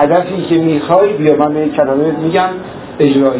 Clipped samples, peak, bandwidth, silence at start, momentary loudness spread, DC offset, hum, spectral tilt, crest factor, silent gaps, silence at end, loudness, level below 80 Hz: 0.2%; 0 dBFS; 4 kHz; 0 s; 4 LU; under 0.1%; none; -11 dB/octave; 12 dB; none; 0 s; -12 LUFS; -48 dBFS